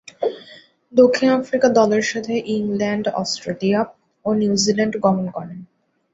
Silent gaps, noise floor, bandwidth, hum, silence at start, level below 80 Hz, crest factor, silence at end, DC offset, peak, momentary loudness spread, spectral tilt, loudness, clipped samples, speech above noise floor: none; -46 dBFS; 8 kHz; none; 0.2 s; -60 dBFS; 18 dB; 0.5 s; under 0.1%; -2 dBFS; 13 LU; -5 dB/octave; -19 LUFS; under 0.1%; 28 dB